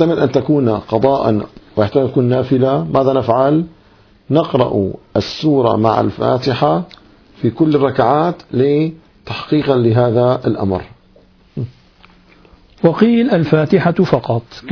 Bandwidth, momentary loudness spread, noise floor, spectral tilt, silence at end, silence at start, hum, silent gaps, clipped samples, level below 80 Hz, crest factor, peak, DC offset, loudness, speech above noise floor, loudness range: 5.4 kHz; 8 LU; -48 dBFS; -8.5 dB/octave; 0 s; 0 s; none; none; under 0.1%; -46 dBFS; 14 dB; 0 dBFS; under 0.1%; -15 LUFS; 34 dB; 3 LU